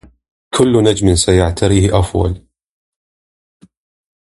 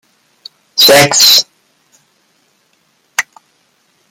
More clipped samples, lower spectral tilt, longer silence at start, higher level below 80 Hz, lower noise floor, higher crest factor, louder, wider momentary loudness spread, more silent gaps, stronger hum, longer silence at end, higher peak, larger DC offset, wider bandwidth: second, under 0.1% vs 0.2%; first, -5.5 dB/octave vs -1 dB/octave; second, 0.55 s vs 0.75 s; first, -28 dBFS vs -54 dBFS; first, under -90 dBFS vs -57 dBFS; about the same, 16 dB vs 14 dB; second, -13 LUFS vs -7 LUFS; second, 9 LU vs 18 LU; neither; neither; first, 1.95 s vs 0.9 s; about the same, 0 dBFS vs 0 dBFS; neither; second, 11.5 kHz vs over 20 kHz